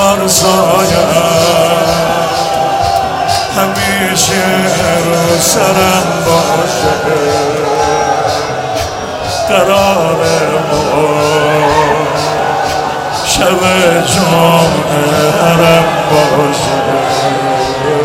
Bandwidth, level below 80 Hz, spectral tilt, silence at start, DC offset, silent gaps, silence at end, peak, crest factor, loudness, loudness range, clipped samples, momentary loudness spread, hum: 17 kHz; -38 dBFS; -4 dB/octave; 0 s; under 0.1%; none; 0 s; 0 dBFS; 10 dB; -10 LUFS; 3 LU; 0.2%; 5 LU; none